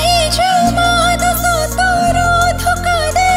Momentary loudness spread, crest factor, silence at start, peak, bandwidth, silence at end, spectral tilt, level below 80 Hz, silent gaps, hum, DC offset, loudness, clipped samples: 2 LU; 12 dB; 0 s; 0 dBFS; 16.5 kHz; 0 s; -3.5 dB/octave; -24 dBFS; none; none; under 0.1%; -13 LUFS; under 0.1%